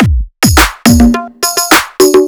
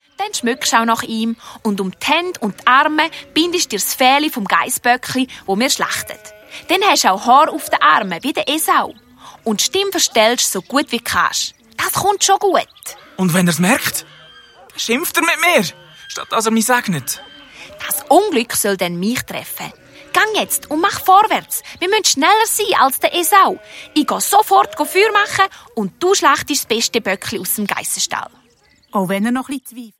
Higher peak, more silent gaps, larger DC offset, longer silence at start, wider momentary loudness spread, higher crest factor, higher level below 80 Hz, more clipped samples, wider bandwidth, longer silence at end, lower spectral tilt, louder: about the same, 0 dBFS vs 0 dBFS; neither; neither; second, 0 s vs 0.2 s; second, 6 LU vs 12 LU; second, 8 dB vs 16 dB; first, -18 dBFS vs -58 dBFS; first, 4% vs under 0.1%; first, over 20 kHz vs 16.5 kHz; about the same, 0 s vs 0.1 s; first, -4 dB/octave vs -2.5 dB/octave; first, -8 LUFS vs -15 LUFS